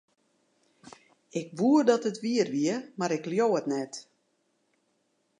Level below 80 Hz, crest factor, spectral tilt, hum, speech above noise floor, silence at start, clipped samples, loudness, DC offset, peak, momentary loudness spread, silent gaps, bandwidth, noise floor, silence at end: -84 dBFS; 20 dB; -5.5 dB/octave; none; 47 dB; 1.35 s; under 0.1%; -28 LUFS; under 0.1%; -10 dBFS; 14 LU; none; 10.5 kHz; -74 dBFS; 1.4 s